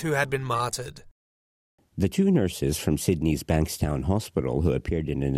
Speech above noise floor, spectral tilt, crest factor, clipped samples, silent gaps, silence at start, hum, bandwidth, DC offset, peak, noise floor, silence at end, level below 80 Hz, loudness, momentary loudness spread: over 65 dB; -6 dB/octave; 18 dB; under 0.1%; 1.11-1.78 s; 0 s; none; 16 kHz; under 0.1%; -8 dBFS; under -90 dBFS; 0 s; -42 dBFS; -26 LUFS; 6 LU